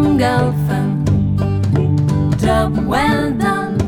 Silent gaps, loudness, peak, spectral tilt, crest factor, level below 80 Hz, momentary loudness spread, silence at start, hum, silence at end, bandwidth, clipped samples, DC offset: none; -16 LUFS; -2 dBFS; -7.5 dB/octave; 12 dB; -30 dBFS; 3 LU; 0 s; none; 0 s; 18.5 kHz; under 0.1%; under 0.1%